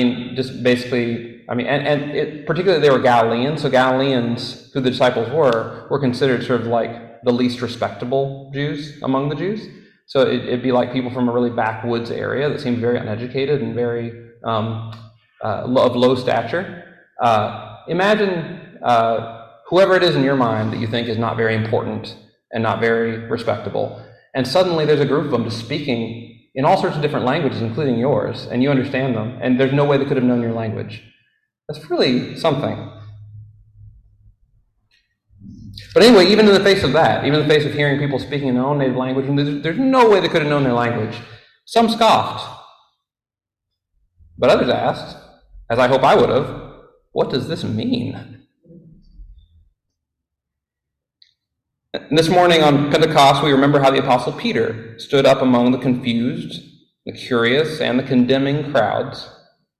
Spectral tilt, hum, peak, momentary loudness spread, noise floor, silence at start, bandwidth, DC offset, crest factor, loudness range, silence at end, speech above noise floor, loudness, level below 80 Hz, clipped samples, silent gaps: -6 dB/octave; none; -2 dBFS; 15 LU; -82 dBFS; 0 s; 13.5 kHz; under 0.1%; 18 dB; 8 LU; 0.5 s; 65 dB; -17 LUFS; -50 dBFS; under 0.1%; none